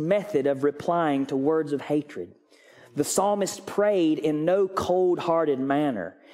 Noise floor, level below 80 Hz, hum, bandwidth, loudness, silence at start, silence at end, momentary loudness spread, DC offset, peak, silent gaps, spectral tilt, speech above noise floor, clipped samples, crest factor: -54 dBFS; -64 dBFS; none; 16 kHz; -25 LUFS; 0 s; 0.25 s; 6 LU; under 0.1%; -10 dBFS; none; -5.5 dB/octave; 29 dB; under 0.1%; 16 dB